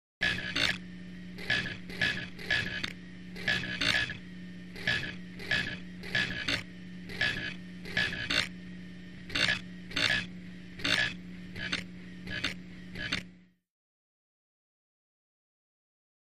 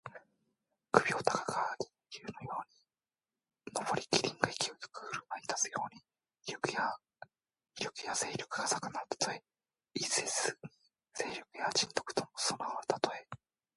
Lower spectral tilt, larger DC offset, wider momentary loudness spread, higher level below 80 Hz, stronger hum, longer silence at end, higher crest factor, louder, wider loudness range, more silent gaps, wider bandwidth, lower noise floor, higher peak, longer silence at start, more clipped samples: about the same, -3 dB/octave vs -2 dB/octave; first, 0.2% vs under 0.1%; about the same, 17 LU vs 16 LU; first, -56 dBFS vs -74 dBFS; neither; first, 2.6 s vs 0.4 s; second, 24 dB vs 32 dB; first, -32 LUFS vs -36 LUFS; first, 9 LU vs 3 LU; neither; first, 15 kHz vs 11.5 kHz; second, -55 dBFS vs under -90 dBFS; second, -12 dBFS vs -6 dBFS; first, 0.2 s vs 0.05 s; neither